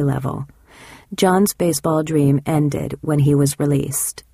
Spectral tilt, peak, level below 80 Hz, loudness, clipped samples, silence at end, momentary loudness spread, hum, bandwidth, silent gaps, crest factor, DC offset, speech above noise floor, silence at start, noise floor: -6 dB/octave; -4 dBFS; -46 dBFS; -18 LUFS; under 0.1%; 0.15 s; 10 LU; none; 15.5 kHz; none; 16 dB; under 0.1%; 26 dB; 0 s; -44 dBFS